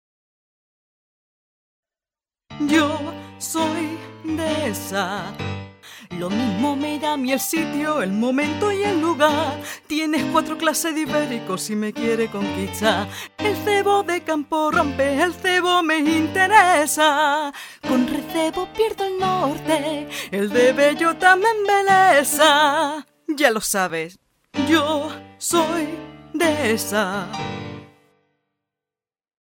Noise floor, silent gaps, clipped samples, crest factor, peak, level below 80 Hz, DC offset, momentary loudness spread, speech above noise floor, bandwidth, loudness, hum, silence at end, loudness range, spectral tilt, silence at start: under -90 dBFS; none; under 0.1%; 20 dB; -2 dBFS; -56 dBFS; under 0.1%; 14 LU; over 70 dB; 19 kHz; -20 LUFS; none; 1.55 s; 9 LU; -3.5 dB/octave; 2.5 s